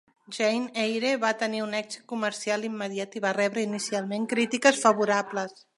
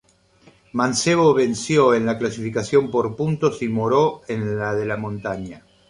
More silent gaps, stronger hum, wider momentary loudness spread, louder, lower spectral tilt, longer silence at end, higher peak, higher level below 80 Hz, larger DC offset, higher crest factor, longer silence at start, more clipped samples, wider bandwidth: neither; neither; about the same, 10 LU vs 11 LU; second, -27 LUFS vs -20 LUFS; second, -3.5 dB/octave vs -5.5 dB/octave; about the same, 0.25 s vs 0.3 s; about the same, -2 dBFS vs -4 dBFS; second, -80 dBFS vs -54 dBFS; neither; first, 24 dB vs 18 dB; second, 0.3 s vs 0.75 s; neither; about the same, 11.5 kHz vs 11 kHz